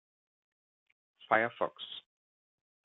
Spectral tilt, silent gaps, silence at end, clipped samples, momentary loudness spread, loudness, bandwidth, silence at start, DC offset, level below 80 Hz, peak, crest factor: -1 dB/octave; none; 0.85 s; under 0.1%; 15 LU; -32 LUFS; 4.1 kHz; 1.3 s; under 0.1%; -84 dBFS; -12 dBFS; 28 dB